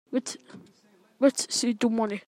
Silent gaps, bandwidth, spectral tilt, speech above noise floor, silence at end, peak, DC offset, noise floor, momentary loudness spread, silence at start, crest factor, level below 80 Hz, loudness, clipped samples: none; 14.5 kHz; -3 dB/octave; 35 dB; 0.1 s; -10 dBFS; under 0.1%; -61 dBFS; 13 LU; 0.1 s; 18 dB; -80 dBFS; -26 LUFS; under 0.1%